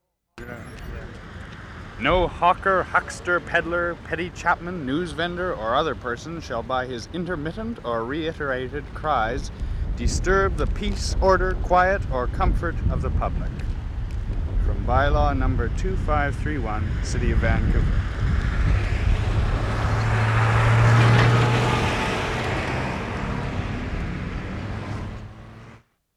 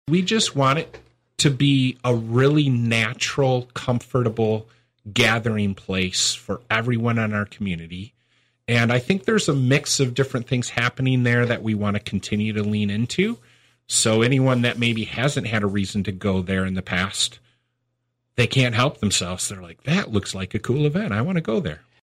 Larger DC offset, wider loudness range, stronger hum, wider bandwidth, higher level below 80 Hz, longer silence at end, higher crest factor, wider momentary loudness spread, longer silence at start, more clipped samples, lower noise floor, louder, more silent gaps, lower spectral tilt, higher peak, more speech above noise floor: neither; first, 7 LU vs 3 LU; neither; second, 11 kHz vs 15 kHz; first, -28 dBFS vs -52 dBFS; about the same, 0.4 s vs 0.3 s; about the same, 18 dB vs 16 dB; first, 12 LU vs 8 LU; first, 0.35 s vs 0.05 s; neither; second, -49 dBFS vs -75 dBFS; second, -24 LUFS vs -21 LUFS; neither; first, -6 dB/octave vs -4.5 dB/octave; about the same, -4 dBFS vs -6 dBFS; second, 27 dB vs 53 dB